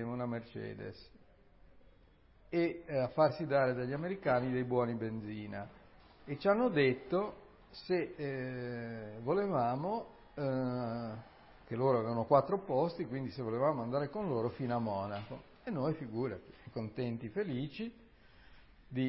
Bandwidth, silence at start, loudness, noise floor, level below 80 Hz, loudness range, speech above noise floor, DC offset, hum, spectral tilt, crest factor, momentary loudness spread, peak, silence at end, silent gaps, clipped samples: 5.6 kHz; 0 s; -36 LUFS; -64 dBFS; -66 dBFS; 5 LU; 28 dB; under 0.1%; none; -6 dB/octave; 22 dB; 15 LU; -14 dBFS; 0 s; none; under 0.1%